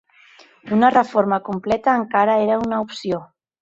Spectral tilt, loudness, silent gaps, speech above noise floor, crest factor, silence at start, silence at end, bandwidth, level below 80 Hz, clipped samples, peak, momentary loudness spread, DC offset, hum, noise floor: -6.5 dB/octave; -19 LUFS; none; 32 dB; 18 dB; 0.65 s; 0.35 s; 7.8 kHz; -56 dBFS; under 0.1%; -2 dBFS; 10 LU; under 0.1%; none; -50 dBFS